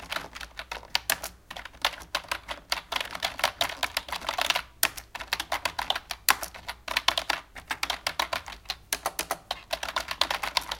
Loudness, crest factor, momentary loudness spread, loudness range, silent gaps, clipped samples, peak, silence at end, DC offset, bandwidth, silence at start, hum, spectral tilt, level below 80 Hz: -30 LUFS; 30 dB; 11 LU; 3 LU; none; under 0.1%; -2 dBFS; 0 s; under 0.1%; 17 kHz; 0 s; none; 0 dB/octave; -52 dBFS